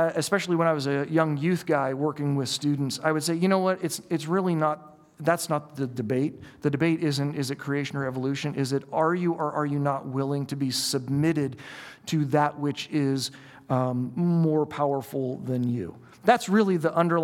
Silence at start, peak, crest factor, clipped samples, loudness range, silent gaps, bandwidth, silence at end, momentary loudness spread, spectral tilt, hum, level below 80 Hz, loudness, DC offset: 0 s; -4 dBFS; 22 dB; under 0.1%; 2 LU; none; 17 kHz; 0 s; 7 LU; -5.5 dB/octave; none; -68 dBFS; -26 LUFS; under 0.1%